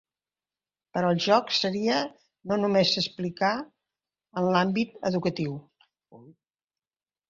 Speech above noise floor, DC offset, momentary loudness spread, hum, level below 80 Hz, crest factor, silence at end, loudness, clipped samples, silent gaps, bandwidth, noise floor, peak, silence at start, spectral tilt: over 64 dB; under 0.1%; 13 LU; none; -68 dBFS; 22 dB; 1 s; -26 LUFS; under 0.1%; none; 7.6 kHz; under -90 dBFS; -8 dBFS; 0.95 s; -5.5 dB/octave